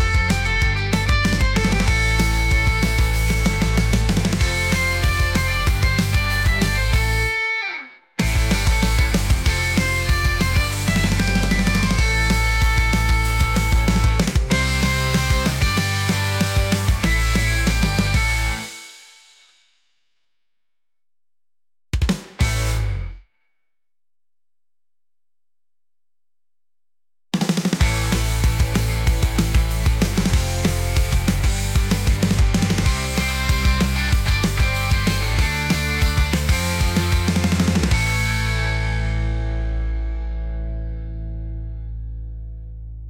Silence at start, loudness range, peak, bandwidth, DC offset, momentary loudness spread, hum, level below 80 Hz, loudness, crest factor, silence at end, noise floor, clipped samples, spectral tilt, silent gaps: 0 s; 8 LU; -6 dBFS; 17 kHz; under 0.1%; 9 LU; none; -24 dBFS; -20 LUFS; 14 dB; 0 s; under -90 dBFS; under 0.1%; -4.5 dB/octave; none